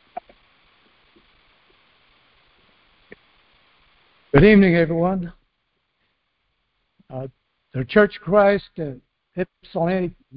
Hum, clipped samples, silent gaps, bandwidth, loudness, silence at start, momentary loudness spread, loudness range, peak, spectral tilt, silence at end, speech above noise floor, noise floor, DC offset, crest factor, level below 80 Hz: none; under 0.1%; none; 5.2 kHz; -19 LUFS; 0.15 s; 23 LU; 6 LU; 0 dBFS; -11.5 dB/octave; 0.25 s; 54 dB; -72 dBFS; under 0.1%; 22 dB; -44 dBFS